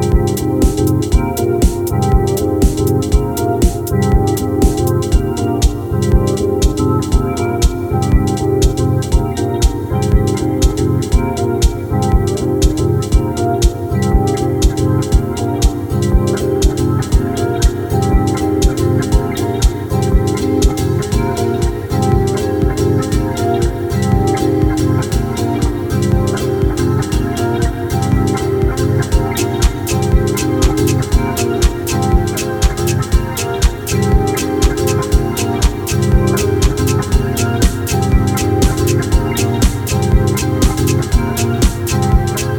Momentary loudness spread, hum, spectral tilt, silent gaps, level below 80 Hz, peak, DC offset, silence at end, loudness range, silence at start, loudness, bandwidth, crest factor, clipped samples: 3 LU; none; -6 dB/octave; none; -18 dBFS; 0 dBFS; 0.1%; 0 s; 1 LU; 0 s; -15 LUFS; 19 kHz; 12 dB; under 0.1%